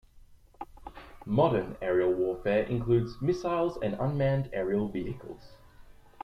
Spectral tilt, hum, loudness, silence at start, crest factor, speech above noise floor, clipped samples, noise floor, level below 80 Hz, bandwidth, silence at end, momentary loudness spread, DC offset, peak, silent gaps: -8.5 dB/octave; none; -29 LUFS; 0.15 s; 18 dB; 26 dB; under 0.1%; -55 dBFS; -52 dBFS; 6.8 kHz; 0.3 s; 20 LU; under 0.1%; -12 dBFS; none